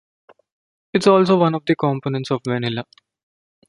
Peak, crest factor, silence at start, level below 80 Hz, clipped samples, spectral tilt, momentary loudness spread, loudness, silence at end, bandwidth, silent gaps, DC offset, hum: -2 dBFS; 18 dB; 0.95 s; -62 dBFS; under 0.1%; -6.5 dB/octave; 10 LU; -19 LUFS; 0.85 s; 11.5 kHz; none; under 0.1%; none